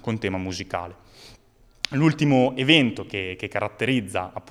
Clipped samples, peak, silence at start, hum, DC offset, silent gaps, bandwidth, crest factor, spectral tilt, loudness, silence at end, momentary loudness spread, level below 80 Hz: under 0.1%; 0 dBFS; 0.05 s; none; under 0.1%; none; 13 kHz; 24 dB; -5.5 dB/octave; -23 LUFS; 0.1 s; 13 LU; -58 dBFS